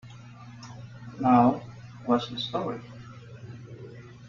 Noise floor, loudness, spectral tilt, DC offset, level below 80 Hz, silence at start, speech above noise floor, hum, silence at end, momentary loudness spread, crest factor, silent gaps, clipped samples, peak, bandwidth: -46 dBFS; -26 LUFS; -7 dB/octave; under 0.1%; -62 dBFS; 0.05 s; 22 dB; 60 Hz at -40 dBFS; 0 s; 24 LU; 20 dB; none; under 0.1%; -8 dBFS; 7.2 kHz